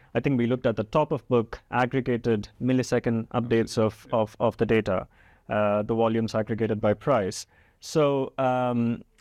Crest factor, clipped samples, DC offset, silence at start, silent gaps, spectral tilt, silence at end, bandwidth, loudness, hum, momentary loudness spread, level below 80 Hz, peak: 16 dB; under 0.1%; under 0.1%; 0.15 s; none; -6.5 dB/octave; 0.2 s; 13.5 kHz; -26 LUFS; none; 6 LU; -52 dBFS; -10 dBFS